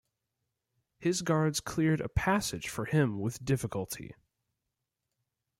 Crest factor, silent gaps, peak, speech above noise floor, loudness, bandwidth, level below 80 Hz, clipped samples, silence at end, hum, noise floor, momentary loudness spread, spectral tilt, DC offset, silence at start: 20 dB; none; -14 dBFS; 55 dB; -31 LUFS; 16.5 kHz; -50 dBFS; under 0.1%; 1.45 s; none; -86 dBFS; 8 LU; -5.5 dB/octave; under 0.1%; 1 s